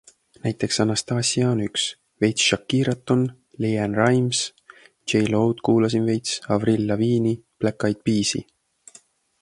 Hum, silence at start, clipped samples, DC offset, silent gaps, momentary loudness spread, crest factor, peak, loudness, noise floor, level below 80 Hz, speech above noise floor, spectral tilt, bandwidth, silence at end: none; 0.45 s; under 0.1%; under 0.1%; none; 7 LU; 18 dB; -4 dBFS; -22 LUFS; -54 dBFS; -56 dBFS; 33 dB; -4.5 dB/octave; 11.5 kHz; 1 s